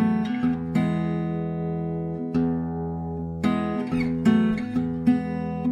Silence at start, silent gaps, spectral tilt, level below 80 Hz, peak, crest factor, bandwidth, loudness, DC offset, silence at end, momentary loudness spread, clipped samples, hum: 0 s; none; -8.5 dB/octave; -48 dBFS; -8 dBFS; 16 dB; 9.4 kHz; -25 LUFS; under 0.1%; 0 s; 8 LU; under 0.1%; none